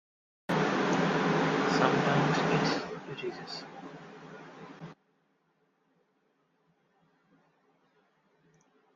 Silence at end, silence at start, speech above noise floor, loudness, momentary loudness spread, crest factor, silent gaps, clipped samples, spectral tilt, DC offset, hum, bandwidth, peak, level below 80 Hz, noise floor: 4.05 s; 0.5 s; 44 dB; -29 LUFS; 22 LU; 22 dB; none; under 0.1%; -5.5 dB/octave; under 0.1%; none; 7.8 kHz; -10 dBFS; -70 dBFS; -73 dBFS